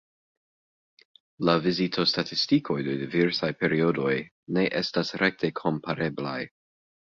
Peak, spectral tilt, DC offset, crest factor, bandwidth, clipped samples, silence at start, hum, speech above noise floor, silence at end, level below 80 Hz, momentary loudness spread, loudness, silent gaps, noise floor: -8 dBFS; -6 dB/octave; under 0.1%; 20 dB; 7.6 kHz; under 0.1%; 1.4 s; none; over 64 dB; 0.7 s; -64 dBFS; 6 LU; -26 LUFS; 4.31-4.47 s; under -90 dBFS